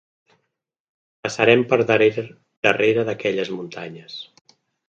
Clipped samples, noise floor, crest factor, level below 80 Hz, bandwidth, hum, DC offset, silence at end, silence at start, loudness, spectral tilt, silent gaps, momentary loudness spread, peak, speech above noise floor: under 0.1%; -78 dBFS; 22 dB; -66 dBFS; 8.4 kHz; none; under 0.1%; 0.65 s; 1.25 s; -19 LUFS; -5 dB/octave; 2.57-2.63 s; 19 LU; 0 dBFS; 58 dB